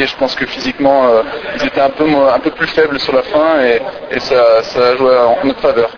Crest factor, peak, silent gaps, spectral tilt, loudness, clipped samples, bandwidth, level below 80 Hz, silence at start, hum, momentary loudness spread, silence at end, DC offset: 12 dB; 0 dBFS; none; -5 dB/octave; -12 LUFS; under 0.1%; 5.4 kHz; -44 dBFS; 0 s; none; 7 LU; 0 s; under 0.1%